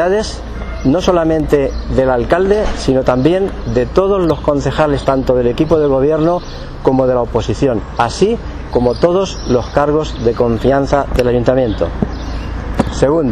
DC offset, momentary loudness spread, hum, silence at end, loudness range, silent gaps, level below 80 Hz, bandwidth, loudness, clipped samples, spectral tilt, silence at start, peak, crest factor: under 0.1%; 6 LU; none; 0 s; 1 LU; none; -26 dBFS; 13 kHz; -14 LUFS; under 0.1%; -6.5 dB/octave; 0 s; 0 dBFS; 14 dB